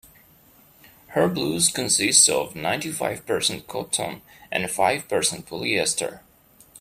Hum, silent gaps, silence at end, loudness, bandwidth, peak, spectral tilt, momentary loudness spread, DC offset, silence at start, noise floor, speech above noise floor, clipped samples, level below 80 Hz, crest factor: none; none; 0 s; -22 LUFS; 16 kHz; 0 dBFS; -2 dB/octave; 13 LU; under 0.1%; 1.1 s; -55 dBFS; 31 dB; under 0.1%; -60 dBFS; 24 dB